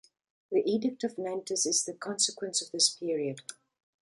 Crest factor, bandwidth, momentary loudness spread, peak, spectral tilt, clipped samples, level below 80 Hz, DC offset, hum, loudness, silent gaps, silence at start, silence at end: 22 dB; 11.5 kHz; 10 LU; -10 dBFS; -2 dB/octave; under 0.1%; -82 dBFS; under 0.1%; none; -30 LUFS; none; 0.5 s; 0.5 s